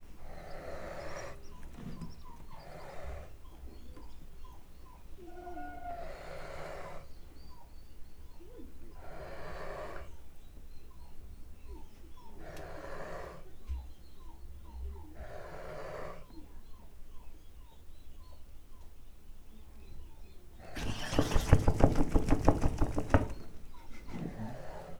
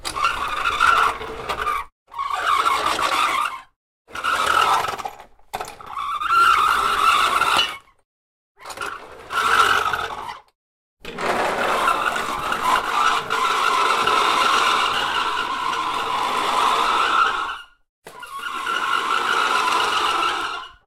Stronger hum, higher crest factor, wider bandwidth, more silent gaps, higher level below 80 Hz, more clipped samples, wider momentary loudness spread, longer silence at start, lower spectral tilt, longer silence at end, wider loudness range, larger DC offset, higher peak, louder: neither; first, 30 dB vs 18 dB; about the same, 15 kHz vs 16 kHz; second, none vs 1.92-2.06 s, 3.76-4.05 s, 8.05-8.55 s, 10.55-10.97 s, 17.89-18.02 s; first, -40 dBFS vs -50 dBFS; neither; first, 25 LU vs 15 LU; about the same, 0 s vs 0 s; first, -6.5 dB/octave vs -1 dB/octave; second, 0 s vs 0.15 s; first, 19 LU vs 4 LU; neither; about the same, -4 dBFS vs -2 dBFS; second, -38 LUFS vs -19 LUFS